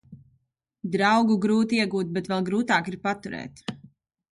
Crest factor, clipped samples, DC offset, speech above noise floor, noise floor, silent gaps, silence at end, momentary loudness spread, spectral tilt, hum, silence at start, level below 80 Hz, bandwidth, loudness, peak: 18 dB; under 0.1%; under 0.1%; 47 dB; -71 dBFS; none; 0.45 s; 16 LU; -5.5 dB/octave; none; 0.1 s; -64 dBFS; 11 kHz; -24 LUFS; -8 dBFS